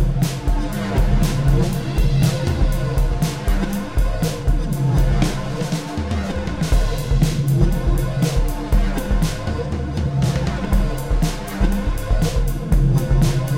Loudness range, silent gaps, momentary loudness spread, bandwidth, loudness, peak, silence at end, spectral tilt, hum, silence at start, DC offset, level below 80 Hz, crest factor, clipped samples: 2 LU; none; 5 LU; 16.5 kHz; -21 LUFS; -2 dBFS; 0 s; -6.5 dB/octave; none; 0 s; 1%; -20 dBFS; 16 dB; under 0.1%